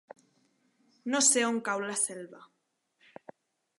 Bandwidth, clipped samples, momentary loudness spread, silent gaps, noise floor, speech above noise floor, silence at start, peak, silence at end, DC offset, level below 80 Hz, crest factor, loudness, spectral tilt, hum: 12 kHz; under 0.1%; 20 LU; none; -79 dBFS; 49 dB; 1.05 s; -12 dBFS; 1.4 s; under 0.1%; -88 dBFS; 22 dB; -27 LUFS; -1 dB/octave; none